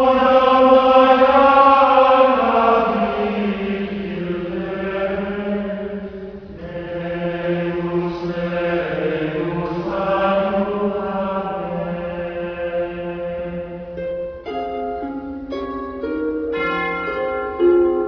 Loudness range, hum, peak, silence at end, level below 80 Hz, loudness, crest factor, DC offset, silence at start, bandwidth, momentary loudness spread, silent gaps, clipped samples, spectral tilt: 12 LU; none; -2 dBFS; 0 s; -44 dBFS; -19 LUFS; 16 dB; under 0.1%; 0 s; 5.4 kHz; 16 LU; none; under 0.1%; -8 dB/octave